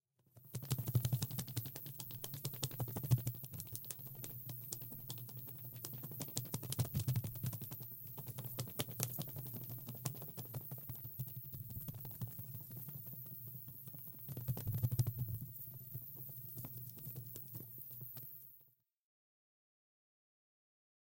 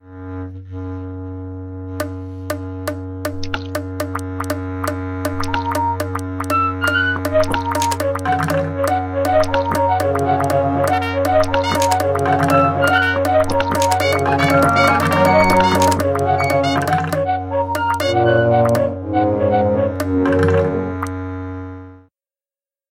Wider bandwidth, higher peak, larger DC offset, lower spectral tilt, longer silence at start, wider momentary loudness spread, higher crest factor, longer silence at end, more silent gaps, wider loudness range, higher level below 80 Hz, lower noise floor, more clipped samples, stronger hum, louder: about the same, 17 kHz vs 17 kHz; second, -12 dBFS vs 0 dBFS; neither; about the same, -5 dB/octave vs -5.5 dB/octave; first, 0.35 s vs 0.05 s; second, 10 LU vs 14 LU; first, 32 dB vs 16 dB; first, 2.5 s vs 0.9 s; neither; second, 7 LU vs 11 LU; second, -68 dBFS vs -42 dBFS; second, -70 dBFS vs under -90 dBFS; neither; neither; second, -44 LUFS vs -17 LUFS